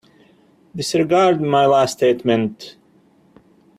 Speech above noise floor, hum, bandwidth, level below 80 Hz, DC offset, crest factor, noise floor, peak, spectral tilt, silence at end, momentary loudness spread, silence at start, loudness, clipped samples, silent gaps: 38 dB; none; 14.5 kHz; -60 dBFS; under 0.1%; 16 dB; -54 dBFS; -4 dBFS; -5.5 dB/octave; 1.1 s; 19 LU; 0.75 s; -17 LUFS; under 0.1%; none